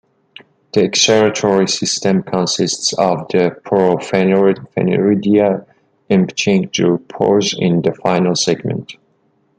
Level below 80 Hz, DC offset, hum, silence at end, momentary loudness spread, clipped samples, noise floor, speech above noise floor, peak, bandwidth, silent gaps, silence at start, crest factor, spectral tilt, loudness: -56 dBFS; under 0.1%; none; 0.65 s; 5 LU; under 0.1%; -59 dBFS; 45 dB; 0 dBFS; 9.4 kHz; none; 0.75 s; 16 dB; -4.5 dB/octave; -15 LUFS